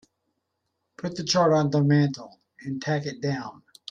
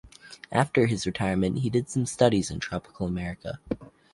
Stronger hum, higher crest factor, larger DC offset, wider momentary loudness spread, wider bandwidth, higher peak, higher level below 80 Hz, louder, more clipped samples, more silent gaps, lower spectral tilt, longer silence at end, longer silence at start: neither; second, 16 dB vs 22 dB; neither; first, 19 LU vs 13 LU; second, 7.6 kHz vs 11.5 kHz; second, -10 dBFS vs -6 dBFS; second, -66 dBFS vs -50 dBFS; first, -24 LUFS vs -27 LUFS; neither; neither; about the same, -6 dB/octave vs -6 dB/octave; first, 0.4 s vs 0.25 s; first, 1 s vs 0.05 s